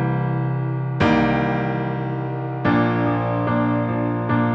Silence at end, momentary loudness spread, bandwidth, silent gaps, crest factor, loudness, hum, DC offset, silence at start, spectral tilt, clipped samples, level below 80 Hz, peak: 0 s; 6 LU; 6 kHz; none; 16 dB; -21 LUFS; none; under 0.1%; 0 s; -9 dB/octave; under 0.1%; -46 dBFS; -4 dBFS